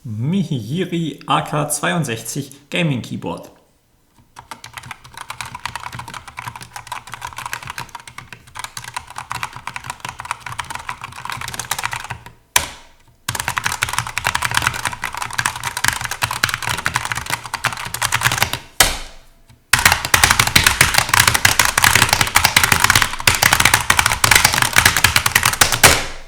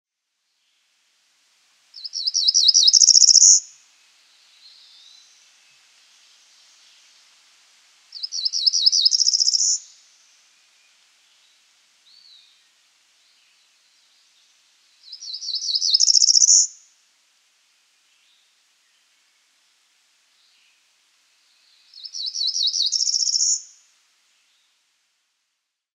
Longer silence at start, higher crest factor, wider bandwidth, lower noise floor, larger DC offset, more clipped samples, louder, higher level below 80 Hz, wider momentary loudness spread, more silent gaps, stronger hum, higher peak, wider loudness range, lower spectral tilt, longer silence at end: second, 0.05 s vs 1.95 s; second, 18 dB vs 24 dB; first, over 20 kHz vs 13.5 kHz; second, -57 dBFS vs -78 dBFS; neither; first, 0.1% vs under 0.1%; about the same, -15 LUFS vs -15 LUFS; first, -38 dBFS vs under -90 dBFS; about the same, 19 LU vs 20 LU; neither; neither; about the same, 0 dBFS vs 0 dBFS; first, 18 LU vs 14 LU; first, -1.5 dB/octave vs 9.5 dB/octave; second, 0 s vs 2.35 s